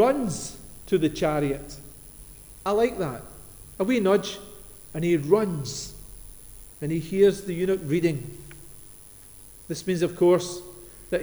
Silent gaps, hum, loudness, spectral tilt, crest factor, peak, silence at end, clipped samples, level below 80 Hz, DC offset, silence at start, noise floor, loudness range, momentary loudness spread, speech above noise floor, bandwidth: none; none; -25 LUFS; -6 dB/octave; 20 dB; -8 dBFS; 0 s; under 0.1%; -50 dBFS; under 0.1%; 0 s; -47 dBFS; 2 LU; 23 LU; 23 dB; over 20 kHz